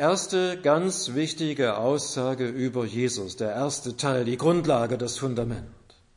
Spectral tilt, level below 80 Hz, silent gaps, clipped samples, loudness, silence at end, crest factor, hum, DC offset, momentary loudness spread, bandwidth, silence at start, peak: -4.5 dB/octave; -56 dBFS; none; under 0.1%; -26 LUFS; 0.4 s; 18 dB; none; under 0.1%; 6 LU; 11 kHz; 0 s; -8 dBFS